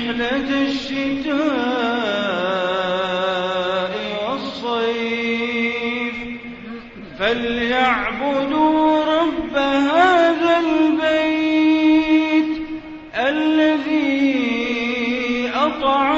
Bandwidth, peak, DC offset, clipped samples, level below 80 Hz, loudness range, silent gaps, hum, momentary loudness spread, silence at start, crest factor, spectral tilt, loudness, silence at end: 7.8 kHz; -2 dBFS; under 0.1%; under 0.1%; -50 dBFS; 6 LU; none; none; 8 LU; 0 s; 16 dB; -5 dB/octave; -19 LUFS; 0 s